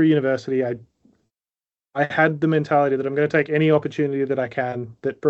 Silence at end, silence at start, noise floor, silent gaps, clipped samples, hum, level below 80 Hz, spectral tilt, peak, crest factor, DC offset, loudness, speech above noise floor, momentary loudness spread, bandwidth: 0 s; 0 s; under -90 dBFS; none; under 0.1%; none; -68 dBFS; -8 dB/octave; -2 dBFS; 18 dB; under 0.1%; -21 LUFS; over 70 dB; 9 LU; 7.6 kHz